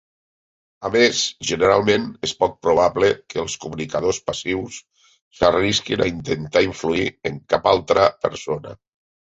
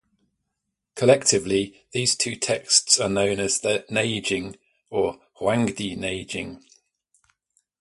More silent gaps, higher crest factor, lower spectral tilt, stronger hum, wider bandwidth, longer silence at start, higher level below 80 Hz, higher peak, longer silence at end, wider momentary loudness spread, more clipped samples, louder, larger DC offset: first, 5.22-5.31 s vs none; about the same, 20 dB vs 24 dB; first, -4 dB/octave vs -2.5 dB/octave; neither; second, 8.2 kHz vs 11.5 kHz; second, 0.8 s vs 0.95 s; first, -48 dBFS vs -56 dBFS; about the same, -2 dBFS vs -2 dBFS; second, 0.65 s vs 1.25 s; about the same, 11 LU vs 12 LU; neither; about the same, -20 LUFS vs -22 LUFS; neither